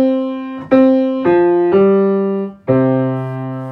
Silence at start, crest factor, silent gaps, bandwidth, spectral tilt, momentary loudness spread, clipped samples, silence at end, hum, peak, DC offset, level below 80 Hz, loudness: 0 s; 12 dB; none; 4.9 kHz; -10.5 dB/octave; 11 LU; under 0.1%; 0 s; none; 0 dBFS; under 0.1%; -54 dBFS; -14 LUFS